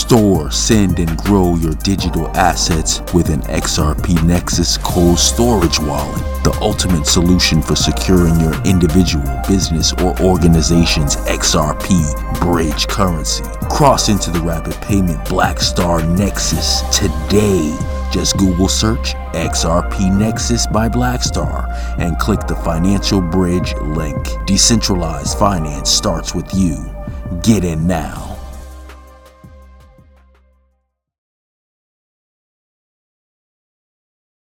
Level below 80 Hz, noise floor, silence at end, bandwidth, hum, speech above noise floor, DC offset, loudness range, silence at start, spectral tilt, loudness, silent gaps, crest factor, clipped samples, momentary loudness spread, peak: -22 dBFS; -66 dBFS; 4.9 s; 18 kHz; none; 52 dB; under 0.1%; 4 LU; 0 s; -4.5 dB/octave; -14 LUFS; none; 14 dB; under 0.1%; 8 LU; 0 dBFS